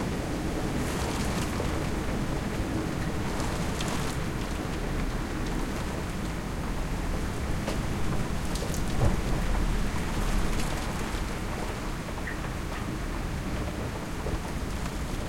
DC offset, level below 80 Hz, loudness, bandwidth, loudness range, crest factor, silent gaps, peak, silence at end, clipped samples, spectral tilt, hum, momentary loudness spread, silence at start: under 0.1%; -34 dBFS; -32 LUFS; 16.5 kHz; 3 LU; 18 dB; none; -10 dBFS; 0 s; under 0.1%; -5.5 dB/octave; none; 4 LU; 0 s